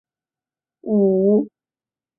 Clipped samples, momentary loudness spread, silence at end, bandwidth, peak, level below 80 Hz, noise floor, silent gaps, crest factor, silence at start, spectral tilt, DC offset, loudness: under 0.1%; 17 LU; 0.7 s; 1.1 kHz; -6 dBFS; -68 dBFS; under -90 dBFS; none; 14 dB; 0.85 s; -17.5 dB/octave; under 0.1%; -18 LUFS